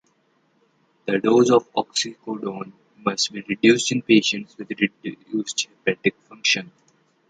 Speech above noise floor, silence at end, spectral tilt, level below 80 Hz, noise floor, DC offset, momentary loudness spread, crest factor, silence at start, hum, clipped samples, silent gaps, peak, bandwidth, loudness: 43 dB; 0.65 s; -3.5 dB/octave; -66 dBFS; -65 dBFS; under 0.1%; 13 LU; 20 dB; 1.05 s; none; under 0.1%; none; -4 dBFS; 9.4 kHz; -21 LUFS